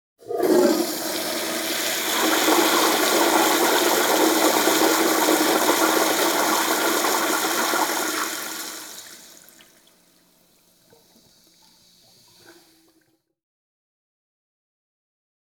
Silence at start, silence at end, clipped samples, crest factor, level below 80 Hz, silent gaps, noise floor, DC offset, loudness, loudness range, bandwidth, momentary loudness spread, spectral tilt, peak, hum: 0.25 s; 2.95 s; under 0.1%; 18 dB; -70 dBFS; none; -65 dBFS; under 0.1%; -20 LUFS; 11 LU; over 20 kHz; 9 LU; -1 dB/octave; -4 dBFS; none